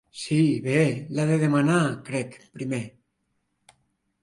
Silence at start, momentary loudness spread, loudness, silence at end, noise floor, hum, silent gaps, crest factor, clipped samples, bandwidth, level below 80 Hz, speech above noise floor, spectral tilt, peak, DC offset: 0.15 s; 12 LU; -24 LUFS; 1.35 s; -75 dBFS; none; none; 16 dB; under 0.1%; 11.5 kHz; -66 dBFS; 51 dB; -6.5 dB/octave; -8 dBFS; under 0.1%